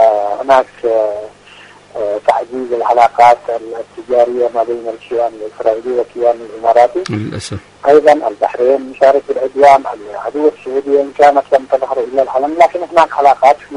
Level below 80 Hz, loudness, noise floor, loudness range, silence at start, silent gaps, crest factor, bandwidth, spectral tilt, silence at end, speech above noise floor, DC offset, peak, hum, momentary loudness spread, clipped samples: -52 dBFS; -12 LUFS; -39 dBFS; 3 LU; 0 s; none; 12 dB; 11 kHz; -5.5 dB/octave; 0 s; 27 dB; under 0.1%; 0 dBFS; 50 Hz at -50 dBFS; 13 LU; 0.5%